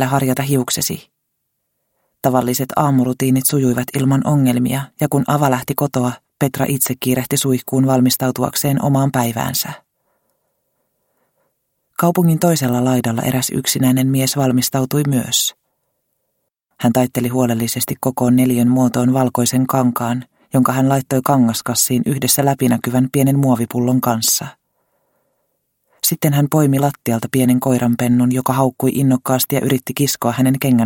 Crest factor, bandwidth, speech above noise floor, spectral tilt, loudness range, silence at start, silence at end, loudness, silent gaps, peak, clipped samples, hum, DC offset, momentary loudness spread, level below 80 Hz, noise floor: 16 dB; 17 kHz; 57 dB; -5 dB/octave; 3 LU; 0 s; 0 s; -16 LUFS; none; 0 dBFS; under 0.1%; none; under 0.1%; 5 LU; -54 dBFS; -72 dBFS